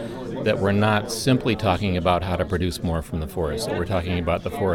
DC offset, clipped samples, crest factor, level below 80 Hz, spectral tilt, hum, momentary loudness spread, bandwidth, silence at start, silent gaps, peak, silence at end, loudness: under 0.1%; under 0.1%; 16 dB; -38 dBFS; -6 dB/octave; none; 6 LU; 17.5 kHz; 0 s; none; -6 dBFS; 0 s; -23 LUFS